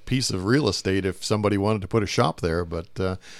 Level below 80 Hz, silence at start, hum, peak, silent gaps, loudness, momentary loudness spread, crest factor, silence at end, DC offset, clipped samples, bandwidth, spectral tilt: -46 dBFS; 0 s; none; -6 dBFS; none; -24 LUFS; 7 LU; 18 dB; 0 s; under 0.1%; under 0.1%; 14.5 kHz; -5 dB/octave